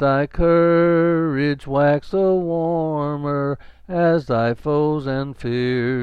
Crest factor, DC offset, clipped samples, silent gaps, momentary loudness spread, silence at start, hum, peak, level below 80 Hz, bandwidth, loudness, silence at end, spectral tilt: 12 dB; under 0.1%; under 0.1%; none; 9 LU; 0 s; none; -6 dBFS; -40 dBFS; 6 kHz; -19 LUFS; 0 s; -9 dB/octave